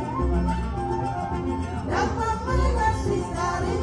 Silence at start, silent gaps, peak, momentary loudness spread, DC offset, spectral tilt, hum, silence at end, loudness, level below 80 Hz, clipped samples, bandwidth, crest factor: 0 s; none; -8 dBFS; 5 LU; under 0.1%; -6.5 dB/octave; none; 0 s; -26 LUFS; -30 dBFS; under 0.1%; 11.5 kHz; 16 dB